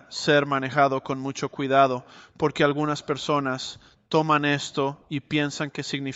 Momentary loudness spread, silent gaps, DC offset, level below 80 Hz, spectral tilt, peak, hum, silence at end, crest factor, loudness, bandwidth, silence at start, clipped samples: 10 LU; none; under 0.1%; -62 dBFS; -5 dB/octave; -6 dBFS; none; 0 s; 20 dB; -24 LUFS; 8.2 kHz; 0.1 s; under 0.1%